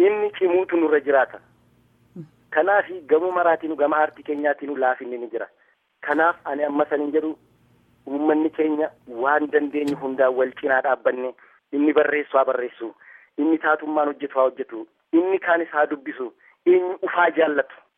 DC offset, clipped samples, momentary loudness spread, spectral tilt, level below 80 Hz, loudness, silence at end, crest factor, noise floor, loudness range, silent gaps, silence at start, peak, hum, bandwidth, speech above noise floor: under 0.1%; under 0.1%; 12 LU; -6.5 dB/octave; -74 dBFS; -22 LUFS; 0.25 s; 18 dB; -59 dBFS; 2 LU; none; 0 s; -4 dBFS; none; 8.2 kHz; 38 dB